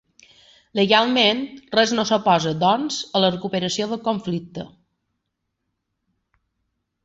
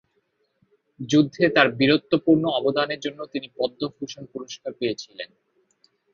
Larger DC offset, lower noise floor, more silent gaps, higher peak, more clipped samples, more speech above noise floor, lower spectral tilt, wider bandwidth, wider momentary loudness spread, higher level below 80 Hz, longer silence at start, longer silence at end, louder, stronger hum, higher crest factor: neither; first, -78 dBFS vs -70 dBFS; neither; about the same, -2 dBFS vs 0 dBFS; neither; first, 57 dB vs 48 dB; second, -4 dB/octave vs -5.5 dB/octave; first, 8 kHz vs 7.2 kHz; second, 12 LU vs 18 LU; about the same, -62 dBFS vs -64 dBFS; second, 0.75 s vs 1 s; first, 2.4 s vs 0.9 s; about the same, -20 LUFS vs -22 LUFS; neither; about the same, 20 dB vs 24 dB